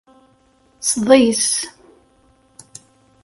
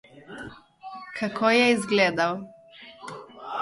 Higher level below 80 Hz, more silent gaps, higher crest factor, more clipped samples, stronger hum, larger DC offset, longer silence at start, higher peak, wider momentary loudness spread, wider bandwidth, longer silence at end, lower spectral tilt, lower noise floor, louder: first, -58 dBFS vs -66 dBFS; neither; about the same, 20 dB vs 20 dB; neither; neither; neither; first, 0.8 s vs 0.15 s; first, 0 dBFS vs -8 dBFS; second, 11 LU vs 23 LU; about the same, 11.5 kHz vs 11.5 kHz; first, 1.55 s vs 0 s; second, -2.5 dB/octave vs -4 dB/octave; first, -56 dBFS vs -48 dBFS; first, -15 LUFS vs -23 LUFS